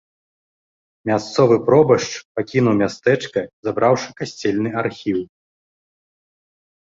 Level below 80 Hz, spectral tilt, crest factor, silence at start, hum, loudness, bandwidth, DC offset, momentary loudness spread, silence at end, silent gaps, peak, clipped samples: -56 dBFS; -6 dB/octave; 20 dB; 1.05 s; none; -19 LUFS; 7.8 kHz; under 0.1%; 12 LU; 1.6 s; 2.25-2.35 s, 3.53-3.63 s; 0 dBFS; under 0.1%